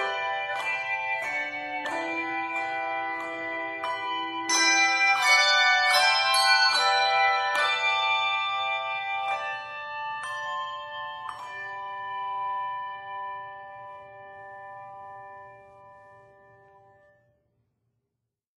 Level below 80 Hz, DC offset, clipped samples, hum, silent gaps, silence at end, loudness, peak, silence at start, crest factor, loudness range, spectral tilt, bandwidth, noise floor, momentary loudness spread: -74 dBFS; under 0.1%; under 0.1%; none; none; 2.4 s; -25 LUFS; -8 dBFS; 0 s; 20 dB; 18 LU; 0.5 dB/octave; 14.5 kHz; -84 dBFS; 23 LU